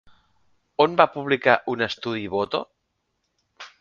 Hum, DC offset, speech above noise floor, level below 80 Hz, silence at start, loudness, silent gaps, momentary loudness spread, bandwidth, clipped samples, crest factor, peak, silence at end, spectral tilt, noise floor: none; under 0.1%; 54 dB; -62 dBFS; 0.8 s; -22 LUFS; none; 11 LU; 7.4 kHz; under 0.1%; 24 dB; 0 dBFS; 0.15 s; -6 dB/octave; -75 dBFS